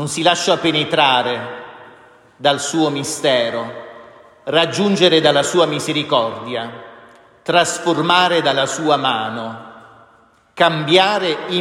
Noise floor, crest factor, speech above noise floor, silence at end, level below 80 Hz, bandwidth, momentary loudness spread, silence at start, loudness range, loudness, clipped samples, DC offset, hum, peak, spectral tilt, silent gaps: -52 dBFS; 18 dB; 36 dB; 0 s; -64 dBFS; 16 kHz; 17 LU; 0 s; 2 LU; -16 LUFS; under 0.1%; under 0.1%; none; 0 dBFS; -3.5 dB/octave; none